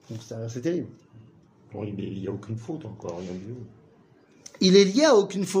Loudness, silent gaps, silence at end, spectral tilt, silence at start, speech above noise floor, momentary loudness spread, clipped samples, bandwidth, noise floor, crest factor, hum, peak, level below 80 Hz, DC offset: -24 LUFS; none; 0 s; -5 dB/octave; 0.1 s; 32 dB; 20 LU; under 0.1%; 15.5 kHz; -57 dBFS; 20 dB; none; -6 dBFS; -66 dBFS; under 0.1%